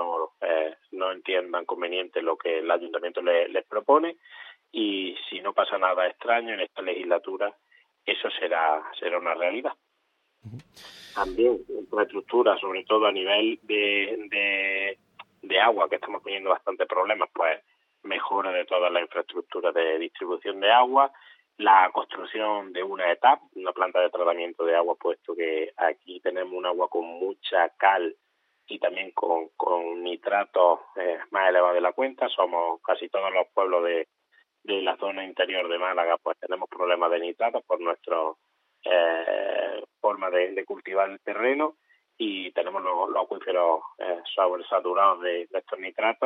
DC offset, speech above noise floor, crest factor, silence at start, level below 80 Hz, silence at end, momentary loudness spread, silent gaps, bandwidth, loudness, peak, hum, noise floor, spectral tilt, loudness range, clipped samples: under 0.1%; 48 dB; 22 dB; 0 s; -68 dBFS; 0 s; 10 LU; none; 6.2 kHz; -26 LUFS; -4 dBFS; none; -73 dBFS; -5 dB/octave; 4 LU; under 0.1%